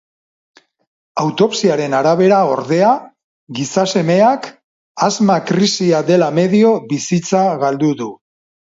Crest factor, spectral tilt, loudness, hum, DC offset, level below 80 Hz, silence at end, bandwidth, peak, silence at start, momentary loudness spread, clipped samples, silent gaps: 14 dB; -5.5 dB/octave; -14 LUFS; none; under 0.1%; -62 dBFS; 0.5 s; 8 kHz; 0 dBFS; 1.15 s; 11 LU; under 0.1%; 3.24-3.47 s, 4.64-4.95 s